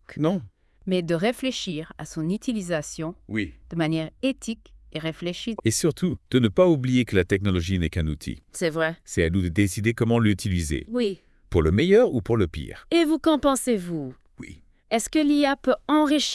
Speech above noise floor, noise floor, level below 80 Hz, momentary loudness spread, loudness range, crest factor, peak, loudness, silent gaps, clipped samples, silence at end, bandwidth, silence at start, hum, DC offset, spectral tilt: 22 dB; -45 dBFS; -44 dBFS; 13 LU; 6 LU; 18 dB; -6 dBFS; -24 LUFS; none; under 0.1%; 0 s; 12 kHz; 0.1 s; none; under 0.1%; -5.5 dB/octave